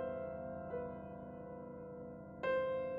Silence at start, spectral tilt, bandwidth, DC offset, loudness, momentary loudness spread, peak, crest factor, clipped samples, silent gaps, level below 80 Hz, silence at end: 0 s; -5 dB/octave; 5.2 kHz; under 0.1%; -44 LUFS; 12 LU; -26 dBFS; 16 dB; under 0.1%; none; -68 dBFS; 0 s